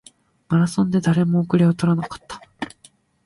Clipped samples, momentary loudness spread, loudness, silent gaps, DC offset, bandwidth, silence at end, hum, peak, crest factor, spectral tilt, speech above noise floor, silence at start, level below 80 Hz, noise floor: under 0.1%; 16 LU; -19 LUFS; none; under 0.1%; 11.5 kHz; 0.55 s; none; -6 dBFS; 16 dB; -7.5 dB/octave; 36 dB; 0.5 s; -54 dBFS; -54 dBFS